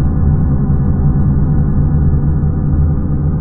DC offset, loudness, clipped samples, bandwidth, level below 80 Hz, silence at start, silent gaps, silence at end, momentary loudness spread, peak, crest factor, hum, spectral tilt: under 0.1%; -14 LUFS; under 0.1%; 2 kHz; -16 dBFS; 0 s; none; 0 s; 2 LU; -2 dBFS; 10 dB; none; -16.5 dB/octave